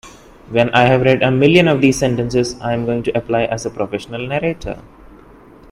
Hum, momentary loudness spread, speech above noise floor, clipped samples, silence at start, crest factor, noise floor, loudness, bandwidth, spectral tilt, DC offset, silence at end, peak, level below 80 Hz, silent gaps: none; 12 LU; 27 dB; under 0.1%; 0.05 s; 16 dB; -42 dBFS; -16 LUFS; 13.5 kHz; -6 dB/octave; under 0.1%; 0.85 s; 0 dBFS; -42 dBFS; none